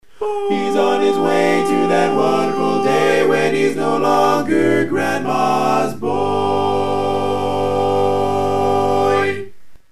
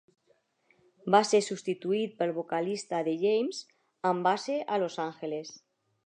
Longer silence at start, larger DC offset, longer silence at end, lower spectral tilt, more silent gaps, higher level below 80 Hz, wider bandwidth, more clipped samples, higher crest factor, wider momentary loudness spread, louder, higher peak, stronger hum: second, 0 s vs 1.05 s; first, 3% vs under 0.1%; second, 0 s vs 0.5 s; about the same, -5.5 dB/octave vs -4.5 dB/octave; neither; first, -58 dBFS vs -86 dBFS; first, 13.5 kHz vs 10.5 kHz; neither; second, 14 dB vs 22 dB; second, 4 LU vs 12 LU; first, -16 LUFS vs -30 LUFS; first, -2 dBFS vs -8 dBFS; neither